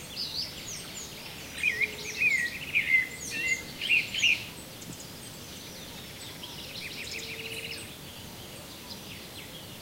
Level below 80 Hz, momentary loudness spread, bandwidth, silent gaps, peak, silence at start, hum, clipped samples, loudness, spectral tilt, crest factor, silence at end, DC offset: -58 dBFS; 17 LU; 16 kHz; none; -14 dBFS; 0 s; none; under 0.1%; -29 LUFS; -1.5 dB/octave; 20 dB; 0 s; under 0.1%